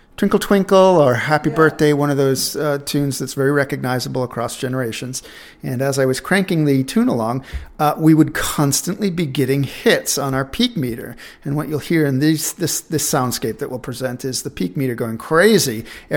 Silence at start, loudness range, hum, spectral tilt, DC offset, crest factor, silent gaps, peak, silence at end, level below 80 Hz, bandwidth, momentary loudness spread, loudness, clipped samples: 0.2 s; 5 LU; none; -5 dB/octave; under 0.1%; 18 dB; none; 0 dBFS; 0 s; -44 dBFS; 19 kHz; 11 LU; -18 LUFS; under 0.1%